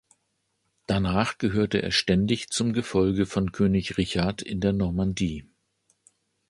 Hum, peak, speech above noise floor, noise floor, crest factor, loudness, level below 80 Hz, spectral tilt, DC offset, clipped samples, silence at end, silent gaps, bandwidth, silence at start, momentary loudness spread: none; -6 dBFS; 50 dB; -75 dBFS; 20 dB; -25 LUFS; -44 dBFS; -5.5 dB/octave; under 0.1%; under 0.1%; 1.05 s; none; 11.5 kHz; 0.9 s; 5 LU